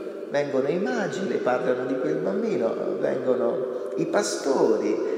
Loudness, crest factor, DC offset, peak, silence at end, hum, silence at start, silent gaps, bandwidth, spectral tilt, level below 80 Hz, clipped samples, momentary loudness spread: -25 LUFS; 16 dB; under 0.1%; -8 dBFS; 0 s; none; 0 s; none; 13.5 kHz; -5 dB/octave; -84 dBFS; under 0.1%; 5 LU